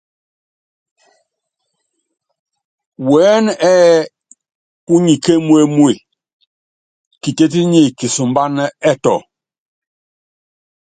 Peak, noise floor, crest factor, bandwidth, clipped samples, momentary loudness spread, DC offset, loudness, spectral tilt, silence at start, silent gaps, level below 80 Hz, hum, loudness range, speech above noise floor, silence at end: 0 dBFS; -74 dBFS; 16 dB; 9.4 kHz; under 0.1%; 11 LU; under 0.1%; -13 LUFS; -5.5 dB/octave; 3 s; 4.55-4.87 s, 6.33-6.40 s, 6.47-7.11 s; -60 dBFS; none; 5 LU; 62 dB; 1.65 s